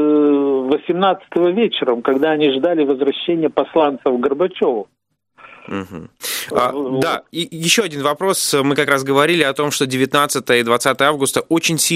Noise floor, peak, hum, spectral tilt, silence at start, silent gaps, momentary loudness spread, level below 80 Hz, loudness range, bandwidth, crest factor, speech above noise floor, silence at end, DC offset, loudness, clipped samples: -47 dBFS; 0 dBFS; none; -3.5 dB/octave; 0 s; none; 6 LU; -60 dBFS; 5 LU; 16 kHz; 16 dB; 31 dB; 0 s; under 0.1%; -16 LUFS; under 0.1%